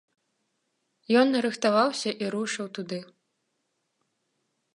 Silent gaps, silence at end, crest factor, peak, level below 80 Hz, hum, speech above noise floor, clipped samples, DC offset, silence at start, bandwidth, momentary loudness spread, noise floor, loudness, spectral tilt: none; 1.7 s; 20 dB; -10 dBFS; -82 dBFS; none; 52 dB; under 0.1%; under 0.1%; 1.1 s; 11.5 kHz; 13 LU; -78 dBFS; -26 LUFS; -4 dB/octave